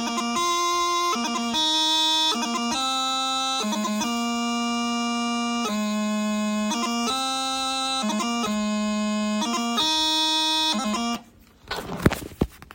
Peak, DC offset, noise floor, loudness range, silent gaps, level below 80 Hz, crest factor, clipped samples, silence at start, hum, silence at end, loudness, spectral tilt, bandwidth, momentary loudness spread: 0 dBFS; under 0.1%; -50 dBFS; 3 LU; none; -48 dBFS; 24 dB; under 0.1%; 0 s; none; 0.05 s; -23 LUFS; -3 dB/octave; 16.5 kHz; 6 LU